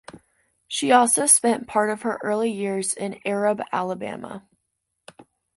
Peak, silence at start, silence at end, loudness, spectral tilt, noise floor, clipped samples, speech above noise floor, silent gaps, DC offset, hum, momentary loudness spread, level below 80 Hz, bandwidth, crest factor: -2 dBFS; 0.15 s; 0.35 s; -21 LUFS; -2.5 dB/octave; -77 dBFS; under 0.1%; 55 dB; none; under 0.1%; none; 15 LU; -68 dBFS; 12 kHz; 22 dB